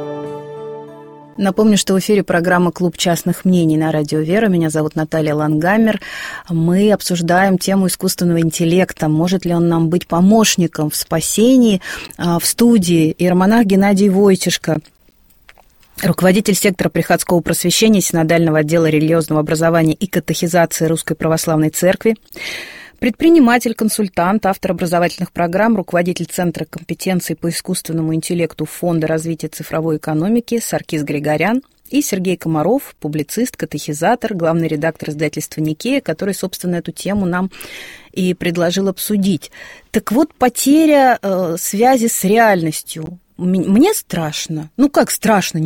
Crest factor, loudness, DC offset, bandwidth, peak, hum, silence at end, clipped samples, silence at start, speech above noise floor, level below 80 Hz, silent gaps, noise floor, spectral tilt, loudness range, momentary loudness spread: 14 dB; -15 LUFS; under 0.1%; 17 kHz; 0 dBFS; none; 0 s; under 0.1%; 0 s; 36 dB; -48 dBFS; none; -51 dBFS; -5 dB/octave; 5 LU; 11 LU